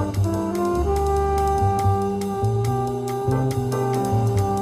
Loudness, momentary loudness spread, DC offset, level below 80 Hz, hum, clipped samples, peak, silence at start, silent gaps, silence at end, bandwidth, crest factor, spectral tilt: -22 LUFS; 3 LU; under 0.1%; -32 dBFS; none; under 0.1%; -8 dBFS; 0 s; none; 0 s; 15.5 kHz; 12 dB; -7.5 dB/octave